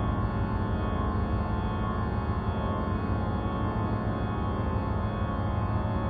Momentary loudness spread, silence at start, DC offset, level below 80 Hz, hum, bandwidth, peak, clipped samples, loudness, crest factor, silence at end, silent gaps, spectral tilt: 1 LU; 0 s; 0.2%; -34 dBFS; none; 4.8 kHz; -16 dBFS; under 0.1%; -30 LUFS; 12 dB; 0 s; none; -10.5 dB/octave